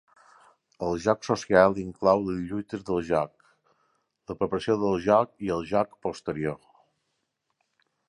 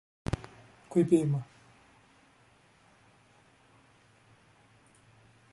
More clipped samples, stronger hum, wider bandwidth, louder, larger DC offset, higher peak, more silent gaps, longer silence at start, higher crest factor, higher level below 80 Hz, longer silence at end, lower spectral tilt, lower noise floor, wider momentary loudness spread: neither; neither; about the same, 11 kHz vs 11.5 kHz; first, -26 LUFS vs -30 LUFS; neither; first, -4 dBFS vs -12 dBFS; neither; first, 0.8 s vs 0.3 s; about the same, 24 dB vs 24 dB; about the same, -56 dBFS vs -56 dBFS; second, 1.5 s vs 4.1 s; second, -6.5 dB/octave vs -8 dB/octave; first, -78 dBFS vs -63 dBFS; second, 12 LU vs 22 LU